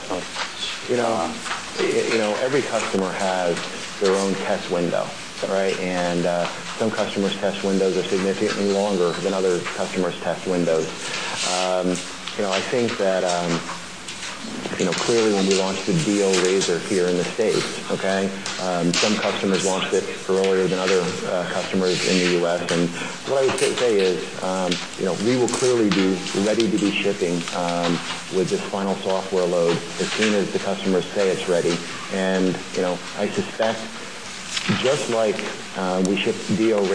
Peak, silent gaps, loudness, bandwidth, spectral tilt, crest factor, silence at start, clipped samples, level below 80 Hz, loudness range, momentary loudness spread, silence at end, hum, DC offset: -4 dBFS; none; -22 LUFS; 11 kHz; -4 dB/octave; 18 dB; 0 s; under 0.1%; -62 dBFS; 3 LU; 7 LU; 0 s; none; 0.6%